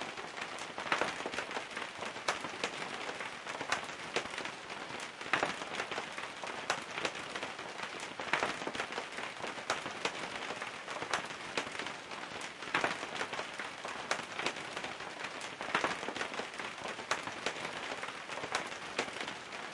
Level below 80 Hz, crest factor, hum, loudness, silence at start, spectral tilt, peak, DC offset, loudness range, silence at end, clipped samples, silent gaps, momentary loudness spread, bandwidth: -74 dBFS; 26 dB; none; -38 LUFS; 0 s; -2 dB/octave; -14 dBFS; under 0.1%; 1 LU; 0 s; under 0.1%; none; 8 LU; 11.5 kHz